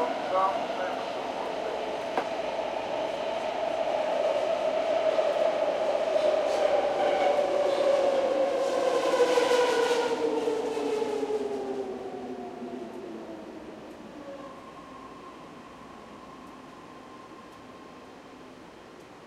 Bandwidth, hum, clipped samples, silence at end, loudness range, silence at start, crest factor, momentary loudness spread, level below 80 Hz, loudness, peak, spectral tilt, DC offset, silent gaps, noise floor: 13.5 kHz; none; under 0.1%; 0 s; 20 LU; 0 s; 18 dB; 22 LU; -66 dBFS; -28 LUFS; -12 dBFS; -3.5 dB/octave; under 0.1%; none; -48 dBFS